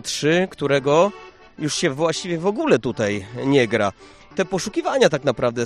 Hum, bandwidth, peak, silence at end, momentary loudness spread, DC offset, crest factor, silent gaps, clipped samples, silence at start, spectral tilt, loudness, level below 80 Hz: none; 13 kHz; -2 dBFS; 0 s; 7 LU; under 0.1%; 18 dB; none; under 0.1%; 0.05 s; -4.5 dB/octave; -20 LUFS; -54 dBFS